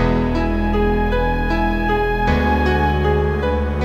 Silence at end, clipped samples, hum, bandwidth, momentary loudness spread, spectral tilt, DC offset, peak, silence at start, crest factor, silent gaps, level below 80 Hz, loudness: 0 s; under 0.1%; none; 14 kHz; 3 LU; -8 dB/octave; under 0.1%; -4 dBFS; 0 s; 12 dB; none; -22 dBFS; -18 LUFS